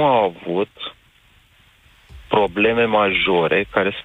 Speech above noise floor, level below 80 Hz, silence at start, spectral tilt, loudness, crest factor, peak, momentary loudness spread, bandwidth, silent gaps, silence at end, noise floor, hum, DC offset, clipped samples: 36 dB; -48 dBFS; 0 s; -7 dB/octave; -18 LUFS; 18 dB; -2 dBFS; 9 LU; 8.8 kHz; none; 0.05 s; -54 dBFS; none; under 0.1%; under 0.1%